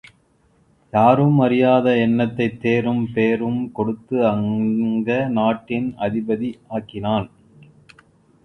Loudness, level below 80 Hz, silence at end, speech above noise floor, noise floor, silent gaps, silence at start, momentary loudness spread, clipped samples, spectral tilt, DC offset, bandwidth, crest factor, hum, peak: -19 LUFS; -54 dBFS; 1.15 s; 40 dB; -59 dBFS; none; 0.95 s; 10 LU; under 0.1%; -9 dB/octave; under 0.1%; 6 kHz; 20 dB; none; 0 dBFS